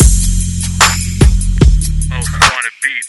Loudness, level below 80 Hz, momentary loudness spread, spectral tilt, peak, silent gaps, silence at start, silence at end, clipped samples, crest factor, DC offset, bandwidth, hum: -12 LUFS; -14 dBFS; 7 LU; -3.5 dB/octave; 0 dBFS; none; 0 s; 0 s; 0.7%; 10 dB; under 0.1%; 12 kHz; none